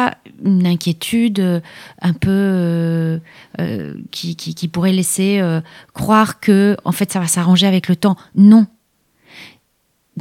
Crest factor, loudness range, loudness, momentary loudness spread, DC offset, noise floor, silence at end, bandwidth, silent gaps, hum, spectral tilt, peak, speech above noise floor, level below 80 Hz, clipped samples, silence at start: 14 dB; 6 LU; -16 LUFS; 13 LU; under 0.1%; -64 dBFS; 0 s; 16 kHz; none; none; -5.5 dB/octave; 0 dBFS; 49 dB; -50 dBFS; under 0.1%; 0 s